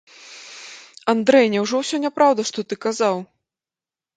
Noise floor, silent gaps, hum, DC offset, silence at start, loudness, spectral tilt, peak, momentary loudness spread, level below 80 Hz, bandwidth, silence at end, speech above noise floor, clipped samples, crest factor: under -90 dBFS; none; none; under 0.1%; 0.25 s; -19 LUFS; -4 dB/octave; -2 dBFS; 22 LU; -72 dBFS; 9.4 kHz; 0.9 s; over 71 dB; under 0.1%; 20 dB